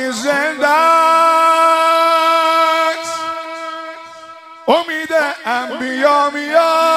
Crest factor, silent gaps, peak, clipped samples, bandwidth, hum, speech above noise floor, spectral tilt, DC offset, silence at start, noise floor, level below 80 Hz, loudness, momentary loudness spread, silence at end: 14 dB; none; 0 dBFS; under 0.1%; 15.5 kHz; none; 22 dB; -1.5 dB/octave; under 0.1%; 0 s; -36 dBFS; -70 dBFS; -13 LUFS; 15 LU; 0 s